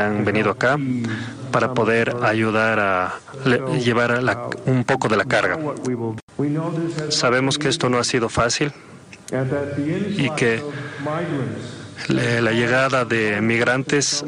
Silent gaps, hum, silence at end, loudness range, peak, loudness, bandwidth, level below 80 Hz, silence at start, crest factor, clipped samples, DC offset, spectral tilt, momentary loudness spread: 6.22-6.28 s; none; 0 s; 3 LU; -4 dBFS; -20 LUFS; 12 kHz; -54 dBFS; 0 s; 16 dB; under 0.1%; under 0.1%; -4.5 dB/octave; 8 LU